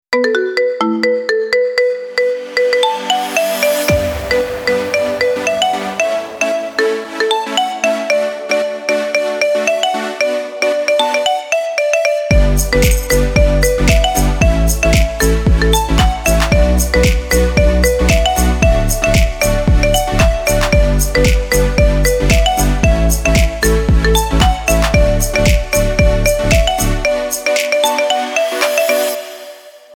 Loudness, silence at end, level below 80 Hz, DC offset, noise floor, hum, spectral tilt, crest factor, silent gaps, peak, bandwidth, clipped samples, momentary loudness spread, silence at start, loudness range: -14 LUFS; 0 s; -18 dBFS; under 0.1%; -35 dBFS; none; -4.5 dB/octave; 12 dB; none; 0 dBFS; 19.5 kHz; under 0.1%; 4 LU; 0.1 s; 3 LU